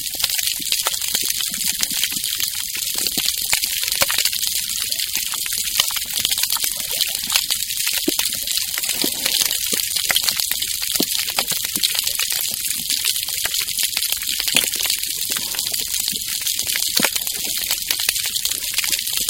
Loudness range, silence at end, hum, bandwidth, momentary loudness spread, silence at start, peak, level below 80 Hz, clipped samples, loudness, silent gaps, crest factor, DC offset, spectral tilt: 1 LU; 0 s; none; 17 kHz; 4 LU; 0 s; 0 dBFS; -50 dBFS; under 0.1%; -18 LUFS; none; 22 dB; under 0.1%; 1 dB/octave